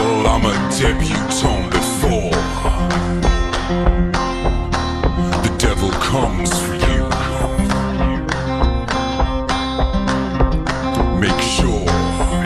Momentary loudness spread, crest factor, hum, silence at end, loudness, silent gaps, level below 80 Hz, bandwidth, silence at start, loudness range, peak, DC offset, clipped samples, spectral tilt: 3 LU; 16 dB; none; 0 s; -18 LUFS; none; -22 dBFS; 13.5 kHz; 0 s; 1 LU; 0 dBFS; under 0.1%; under 0.1%; -5 dB/octave